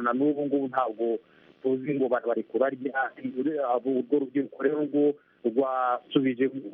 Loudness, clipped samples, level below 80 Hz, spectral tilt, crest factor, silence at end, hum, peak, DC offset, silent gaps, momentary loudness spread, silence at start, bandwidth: -28 LUFS; under 0.1%; -78 dBFS; -5 dB/octave; 16 dB; 0 s; none; -10 dBFS; under 0.1%; none; 5 LU; 0 s; 3.8 kHz